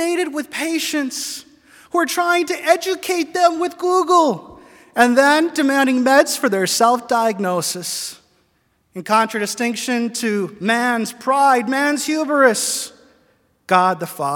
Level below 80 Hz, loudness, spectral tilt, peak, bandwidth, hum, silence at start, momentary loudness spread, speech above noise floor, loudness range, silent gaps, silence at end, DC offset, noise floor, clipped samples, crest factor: -66 dBFS; -17 LUFS; -3 dB/octave; 0 dBFS; 18 kHz; none; 0 s; 9 LU; 46 dB; 5 LU; none; 0 s; under 0.1%; -63 dBFS; under 0.1%; 18 dB